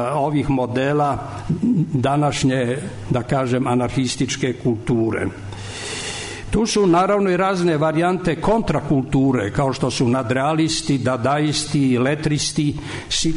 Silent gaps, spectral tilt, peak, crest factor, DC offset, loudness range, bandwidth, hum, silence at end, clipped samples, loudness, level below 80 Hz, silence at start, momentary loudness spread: none; -5.5 dB/octave; -8 dBFS; 12 dB; under 0.1%; 3 LU; 11 kHz; none; 0 s; under 0.1%; -20 LUFS; -40 dBFS; 0 s; 8 LU